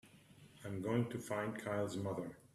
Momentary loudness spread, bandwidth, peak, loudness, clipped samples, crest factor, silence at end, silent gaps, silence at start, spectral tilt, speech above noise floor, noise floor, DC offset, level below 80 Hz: 8 LU; 14 kHz; -22 dBFS; -41 LUFS; under 0.1%; 20 dB; 0.1 s; none; 0.05 s; -6.5 dB/octave; 22 dB; -62 dBFS; under 0.1%; -74 dBFS